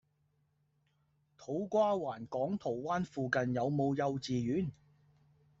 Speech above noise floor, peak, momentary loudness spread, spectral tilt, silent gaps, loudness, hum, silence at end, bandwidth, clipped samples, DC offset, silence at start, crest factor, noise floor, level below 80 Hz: 42 dB; -16 dBFS; 8 LU; -6 dB/octave; none; -35 LUFS; none; 0.9 s; 8 kHz; under 0.1%; under 0.1%; 1.4 s; 20 dB; -76 dBFS; -70 dBFS